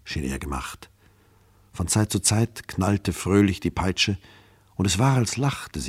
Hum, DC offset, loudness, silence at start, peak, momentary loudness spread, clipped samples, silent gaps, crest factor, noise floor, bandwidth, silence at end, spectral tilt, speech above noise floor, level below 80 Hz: none; under 0.1%; -24 LUFS; 0.05 s; -4 dBFS; 13 LU; under 0.1%; none; 20 dB; -57 dBFS; 15.5 kHz; 0 s; -4.5 dB/octave; 34 dB; -42 dBFS